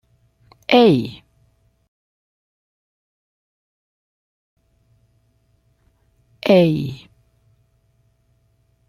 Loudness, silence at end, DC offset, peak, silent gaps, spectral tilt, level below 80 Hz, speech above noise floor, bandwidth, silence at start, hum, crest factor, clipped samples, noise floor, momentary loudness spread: -16 LUFS; 1.95 s; under 0.1%; -2 dBFS; 1.88-4.57 s; -7.5 dB/octave; -60 dBFS; 47 dB; 15 kHz; 0.7 s; none; 22 dB; under 0.1%; -62 dBFS; 20 LU